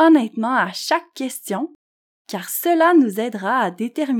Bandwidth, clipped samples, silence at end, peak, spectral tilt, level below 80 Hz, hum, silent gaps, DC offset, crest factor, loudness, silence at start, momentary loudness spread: 19 kHz; under 0.1%; 0 s; -4 dBFS; -4 dB/octave; under -90 dBFS; none; 1.75-2.25 s; under 0.1%; 14 dB; -19 LUFS; 0 s; 14 LU